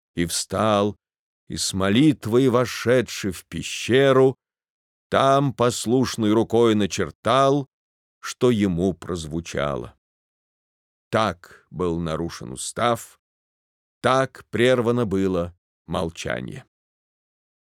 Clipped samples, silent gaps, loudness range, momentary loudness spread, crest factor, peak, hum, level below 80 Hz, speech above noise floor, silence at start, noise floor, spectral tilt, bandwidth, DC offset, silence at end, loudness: under 0.1%; 1.19-1.47 s, 4.70-5.10 s, 7.15-7.23 s, 7.73-8.21 s, 9.98-11.11 s, 13.19-14.01 s, 15.58-15.85 s; 7 LU; 12 LU; 20 dB; -2 dBFS; none; -54 dBFS; over 69 dB; 0.15 s; under -90 dBFS; -5 dB/octave; 17 kHz; under 0.1%; 1 s; -22 LUFS